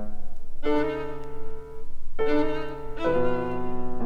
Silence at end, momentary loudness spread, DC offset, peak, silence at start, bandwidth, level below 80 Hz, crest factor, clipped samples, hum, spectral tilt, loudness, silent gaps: 0 s; 18 LU; under 0.1%; -10 dBFS; 0 s; 4.7 kHz; -34 dBFS; 12 dB; under 0.1%; none; -7.5 dB/octave; -28 LUFS; none